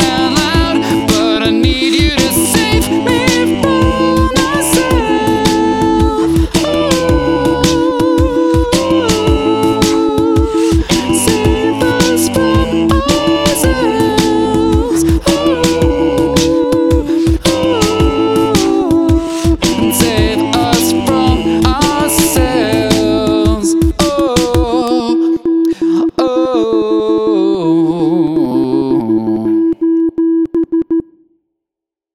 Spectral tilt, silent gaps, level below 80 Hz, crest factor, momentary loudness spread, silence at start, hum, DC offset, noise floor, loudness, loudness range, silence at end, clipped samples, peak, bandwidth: -5 dB/octave; none; -24 dBFS; 12 dB; 2 LU; 0 s; none; under 0.1%; -83 dBFS; -12 LUFS; 1 LU; 1.15 s; under 0.1%; 0 dBFS; 16.5 kHz